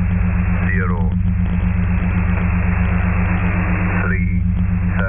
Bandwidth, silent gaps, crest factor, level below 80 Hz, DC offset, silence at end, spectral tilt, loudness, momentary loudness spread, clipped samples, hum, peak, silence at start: 3.5 kHz; none; 12 dB; -20 dBFS; under 0.1%; 0 s; -13.5 dB/octave; -18 LUFS; 1 LU; under 0.1%; none; -4 dBFS; 0 s